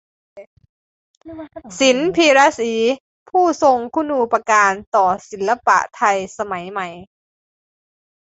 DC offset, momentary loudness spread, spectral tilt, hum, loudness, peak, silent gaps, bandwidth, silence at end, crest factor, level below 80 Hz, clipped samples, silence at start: under 0.1%; 15 LU; -3 dB/octave; none; -17 LUFS; -2 dBFS; 0.47-0.57 s, 0.69-1.21 s, 3.00-3.26 s, 4.87-4.92 s; 8.2 kHz; 1.25 s; 18 dB; -58 dBFS; under 0.1%; 0.35 s